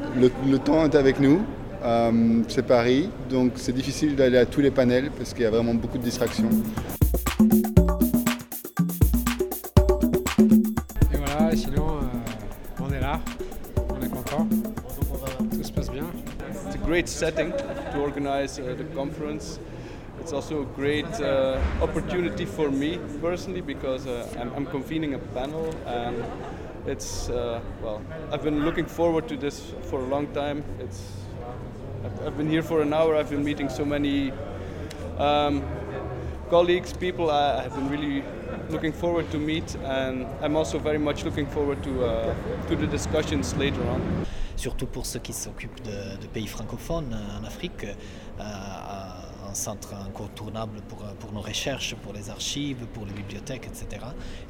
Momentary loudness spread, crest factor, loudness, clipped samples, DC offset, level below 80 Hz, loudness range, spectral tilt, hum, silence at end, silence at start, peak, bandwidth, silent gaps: 15 LU; 24 dB; -26 LUFS; under 0.1%; under 0.1%; -36 dBFS; 11 LU; -6 dB/octave; none; 0 s; 0 s; -2 dBFS; 19.5 kHz; none